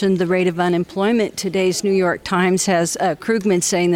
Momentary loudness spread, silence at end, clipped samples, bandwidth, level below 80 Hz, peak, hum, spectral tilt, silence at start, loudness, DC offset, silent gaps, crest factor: 3 LU; 0 s; under 0.1%; 16.5 kHz; -54 dBFS; -6 dBFS; none; -4.5 dB/octave; 0 s; -18 LUFS; under 0.1%; none; 12 dB